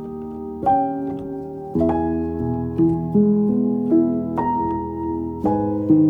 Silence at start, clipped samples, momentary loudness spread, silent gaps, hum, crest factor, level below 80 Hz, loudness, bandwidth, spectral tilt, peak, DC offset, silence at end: 0 s; under 0.1%; 10 LU; none; none; 14 dB; -46 dBFS; -21 LUFS; 3.6 kHz; -11.5 dB/octave; -6 dBFS; under 0.1%; 0 s